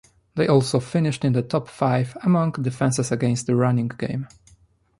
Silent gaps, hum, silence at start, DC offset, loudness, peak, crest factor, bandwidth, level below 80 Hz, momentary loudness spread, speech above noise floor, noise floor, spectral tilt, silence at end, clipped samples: none; none; 0.35 s; under 0.1%; -22 LUFS; -4 dBFS; 18 dB; 11.5 kHz; -56 dBFS; 9 LU; 36 dB; -57 dBFS; -6.5 dB/octave; 0.75 s; under 0.1%